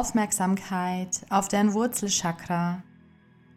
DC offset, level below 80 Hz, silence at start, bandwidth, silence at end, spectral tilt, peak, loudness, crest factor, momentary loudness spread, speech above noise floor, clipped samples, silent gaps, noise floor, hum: under 0.1%; -52 dBFS; 0 s; 16.5 kHz; 0.75 s; -4 dB/octave; -10 dBFS; -26 LUFS; 18 dB; 6 LU; 30 dB; under 0.1%; none; -56 dBFS; none